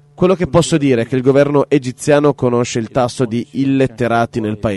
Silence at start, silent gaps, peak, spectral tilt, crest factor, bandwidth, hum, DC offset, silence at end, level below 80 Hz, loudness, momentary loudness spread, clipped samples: 0.2 s; none; 0 dBFS; -6 dB/octave; 14 dB; 11.5 kHz; none; under 0.1%; 0 s; -44 dBFS; -15 LUFS; 6 LU; under 0.1%